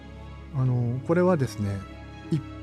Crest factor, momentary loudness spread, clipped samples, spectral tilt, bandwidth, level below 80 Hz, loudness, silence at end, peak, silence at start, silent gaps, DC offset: 14 dB; 19 LU; under 0.1%; -8.5 dB/octave; 12 kHz; -48 dBFS; -27 LUFS; 0 s; -12 dBFS; 0 s; none; under 0.1%